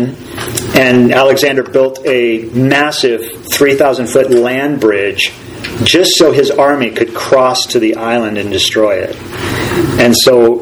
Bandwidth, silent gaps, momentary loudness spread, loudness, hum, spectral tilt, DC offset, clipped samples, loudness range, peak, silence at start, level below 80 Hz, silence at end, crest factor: over 20 kHz; none; 10 LU; -10 LUFS; none; -4 dB/octave; under 0.1%; 0.6%; 2 LU; 0 dBFS; 0 s; -42 dBFS; 0 s; 10 dB